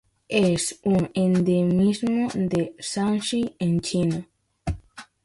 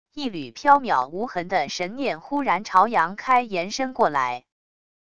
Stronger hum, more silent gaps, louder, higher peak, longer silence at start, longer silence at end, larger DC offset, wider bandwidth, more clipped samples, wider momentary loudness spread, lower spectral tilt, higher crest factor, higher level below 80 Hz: neither; neither; about the same, -24 LUFS vs -23 LUFS; second, -8 dBFS vs -2 dBFS; first, 0.3 s vs 0.05 s; second, 0.2 s vs 0.65 s; second, under 0.1% vs 0.5%; first, 11.5 kHz vs 10 kHz; neither; about the same, 12 LU vs 10 LU; first, -6 dB/octave vs -4 dB/octave; about the same, 16 dB vs 20 dB; first, -46 dBFS vs -60 dBFS